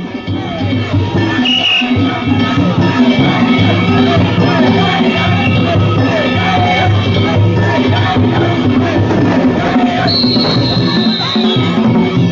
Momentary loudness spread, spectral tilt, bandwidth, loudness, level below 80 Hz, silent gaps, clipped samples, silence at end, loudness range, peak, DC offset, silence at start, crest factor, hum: 3 LU; -7 dB/octave; 7.4 kHz; -11 LUFS; -32 dBFS; none; under 0.1%; 0 s; 1 LU; 0 dBFS; under 0.1%; 0 s; 10 dB; none